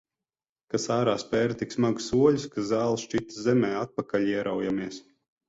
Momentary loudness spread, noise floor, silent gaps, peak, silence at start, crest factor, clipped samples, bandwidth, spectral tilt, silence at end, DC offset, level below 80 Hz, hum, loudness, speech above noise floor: 9 LU; under -90 dBFS; none; -8 dBFS; 0.75 s; 18 dB; under 0.1%; 8 kHz; -5.5 dB/octave; 0.5 s; under 0.1%; -60 dBFS; none; -27 LUFS; over 64 dB